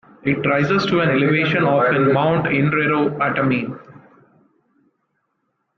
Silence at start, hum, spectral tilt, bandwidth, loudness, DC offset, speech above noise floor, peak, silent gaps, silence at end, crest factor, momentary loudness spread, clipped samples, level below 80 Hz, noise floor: 0.25 s; none; -7.5 dB/octave; 6.8 kHz; -17 LUFS; under 0.1%; 54 dB; -4 dBFS; none; 1.85 s; 14 dB; 5 LU; under 0.1%; -56 dBFS; -72 dBFS